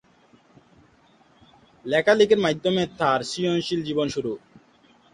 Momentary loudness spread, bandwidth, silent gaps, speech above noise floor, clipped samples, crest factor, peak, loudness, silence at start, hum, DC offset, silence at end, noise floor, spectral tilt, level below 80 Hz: 12 LU; 11 kHz; none; 36 dB; under 0.1%; 20 dB; -6 dBFS; -22 LUFS; 1.85 s; none; under 0.1%; 0.75 s; -58 dBFS; -5 dB/octave; -60 dBFS